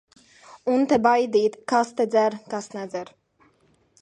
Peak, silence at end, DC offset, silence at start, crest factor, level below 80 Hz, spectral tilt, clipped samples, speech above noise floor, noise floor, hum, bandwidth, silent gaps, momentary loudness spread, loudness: -6 dBFS; 0.95 s; under 0.1%; 0.65 s; 20 dB; -68 dBFS; -5 dB/octave; under 0.1%; 41 dB; -63 dBFS; none; 10.5 kHz; none; 14 LU; -23 LUFS